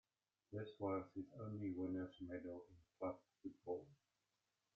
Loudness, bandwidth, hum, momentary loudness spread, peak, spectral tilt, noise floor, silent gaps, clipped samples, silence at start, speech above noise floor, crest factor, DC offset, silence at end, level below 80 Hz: -50 LUFS; 6.6 kHz; none; 11 LU; -30 dBFS; -7.5 dB/octave; -90 dBFS; none; under 0.1%; 0.5 s; 41 dB; 20 dB; under 0.1%; 0.8 s; -82 dBFS